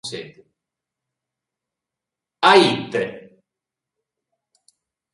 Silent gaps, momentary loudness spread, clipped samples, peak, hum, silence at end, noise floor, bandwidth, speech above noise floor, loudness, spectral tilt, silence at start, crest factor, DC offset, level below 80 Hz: none; 19 LU; under 0.1%; 0 dBFS; none; 1.95 s; -86 dBFS; 11.5 kHz; 69 dB; -17 LUFS; -4 dB/octave; 0.05 s; 24 dB; under 0.1%; -66 dBFS